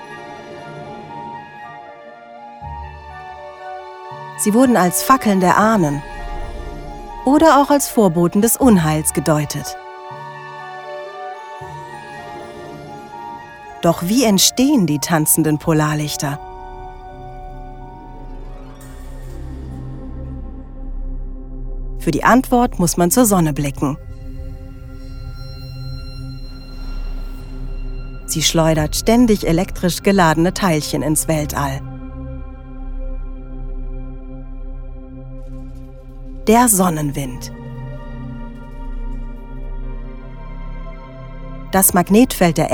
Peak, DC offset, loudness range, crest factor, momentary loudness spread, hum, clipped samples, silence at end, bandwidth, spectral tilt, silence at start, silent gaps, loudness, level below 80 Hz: 0 dBFS; under 0.1%; 18 LU; 18 dB; 22 LU; none; under 0.1%; 0 s; over 20 kHz; -4.5 dB/octave; 0 s; none; -15 LUFS; -30 dBFS